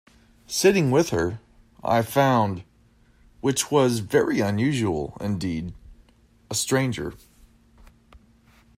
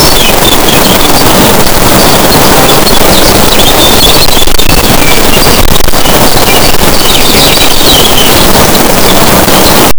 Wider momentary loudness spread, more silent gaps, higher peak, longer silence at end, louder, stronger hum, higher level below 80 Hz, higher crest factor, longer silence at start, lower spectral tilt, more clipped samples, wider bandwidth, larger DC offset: first, 13 LU vs 2 LU; neither; second, -4 dBFS vs 0 dBFS; first, 0.6 s vs 0 s; second, -23 LUFS vs -3 LUFS; neither; second, -52 dBFS vs -12 dBFS; first, 20 dB vs 2 dB; first, 0.5 s vs 0 s; first, -5 dB/octave vs -3 dB/octave; second, under 0.1% vs 60%; second, 16 kHz vs over 20 kHz; neither